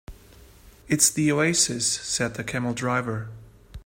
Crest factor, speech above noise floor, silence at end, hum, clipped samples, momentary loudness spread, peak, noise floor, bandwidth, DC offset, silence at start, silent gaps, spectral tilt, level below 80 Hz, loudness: 22 dB; 26 dB; 0.05 s; none; under 0.1%; 11 LU; -4 dBFS; -50 dBFS; 16 kHz; under 0.1%; 0.1 s; none; -3 dB/octave; -50 dBFS; -23 LUFS